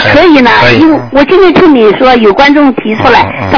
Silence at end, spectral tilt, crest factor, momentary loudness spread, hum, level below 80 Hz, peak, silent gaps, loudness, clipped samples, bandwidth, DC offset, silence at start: 0 s; -6.5 dB/octave; 4 dB; 4 LU; none; -30 dBFS; 0 dBFS; none; -4 LUFS; 20%; 5.4 kHz; under 0.1%; 0 s